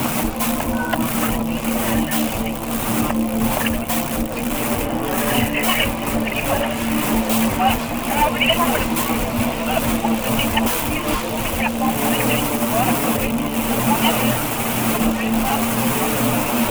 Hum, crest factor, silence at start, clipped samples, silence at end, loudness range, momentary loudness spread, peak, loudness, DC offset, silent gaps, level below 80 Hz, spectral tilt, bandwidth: none; 18 dB; 0 s; under 0.1%; 0 s; 2 LU; 4 LU; -2 dBFS; -19 LUFS; under 0.1%; none; -34 dBFS; -4 dB/octave; over 20 kHz